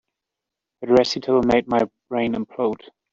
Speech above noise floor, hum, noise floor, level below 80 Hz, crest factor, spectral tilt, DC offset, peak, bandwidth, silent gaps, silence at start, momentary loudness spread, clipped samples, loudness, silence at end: 65 dB; none; -85 dBFS; -54 dBFS; 18 dB; -5.5 dB/octave; under 0.1%; -2 dBFS; 7.6 kHz; none; 0.8 s; 8 LU; under 0.1%; -21 LUFS; 0.4 s